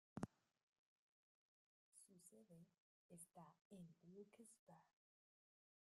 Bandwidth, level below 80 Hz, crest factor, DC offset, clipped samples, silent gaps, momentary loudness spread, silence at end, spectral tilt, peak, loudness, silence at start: 12 kHz; -88 dBFS; 32 dB; under 0.1%; under 0.1%; 0.63-1.92 s, 2.80-3.09 s, 3.61-3.70 s, 4.59-4.67 s; 12 LU; 1.05 s; -6 dB/octave; -32 dBFS; -63 LUFS; 0.15 s